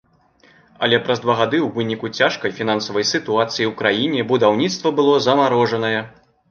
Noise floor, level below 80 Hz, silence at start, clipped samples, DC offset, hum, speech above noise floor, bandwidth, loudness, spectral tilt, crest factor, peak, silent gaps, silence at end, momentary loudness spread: -54 dBFS; -62 dBFS; 0.8 s; under 0.1%; under 0.1%; none; 36 dB; 7.2 kHz; -18 LUFS; -4.5 dB/octave; 18 dB; 0 dBFS; none; 0.4 s; 7 LU